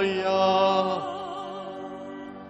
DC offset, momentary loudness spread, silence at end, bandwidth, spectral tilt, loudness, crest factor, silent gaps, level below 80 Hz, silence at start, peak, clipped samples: under 0.1%; 17 LU; 0 s; 8.2 kHz; -5.5 dB/octave; -25 LUFS; 16 dB; none; -66 dBFS; 0 s; -10 dBFS; under 0.1%